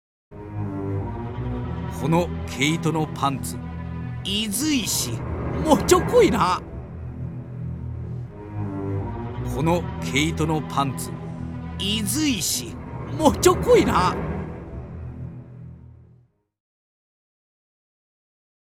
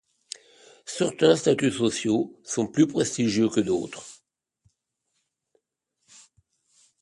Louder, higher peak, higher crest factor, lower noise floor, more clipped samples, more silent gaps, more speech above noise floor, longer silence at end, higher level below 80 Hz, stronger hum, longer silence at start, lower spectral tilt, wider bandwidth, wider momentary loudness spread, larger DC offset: about the same, -23 LUFS vs -24 LUFS; about the same, -4 dBFS vs -6 dBFS; about the same, 22 dB vs 22 dB; second, -57 dBFS vs -78 dBFS; neither; neither; second, 36 dB vs 54 dB; second, 2.65 s vs 2.9 s; first, -40 dBFS vs -64 dBFS; neither; second, 0.3 s vs 0.85 s; about the same, -4.5 dB/octave vs -4.5 dB/octave; first, 18.5 kHz vs 11.5 kHz; second, 18 LU vs 21 LU; neither